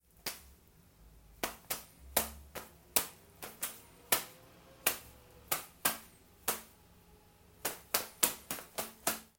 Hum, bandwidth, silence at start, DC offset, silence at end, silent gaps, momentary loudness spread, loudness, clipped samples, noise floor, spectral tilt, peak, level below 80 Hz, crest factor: none; 17 kHz; 0.25 s; under 0.1%; 0.15 s; none; 16 LU; -36 LUFS; under 0.1%; -62 dBFS; -0.5 dB/octave; -8 dBFS; -62 dBFS; 32 dB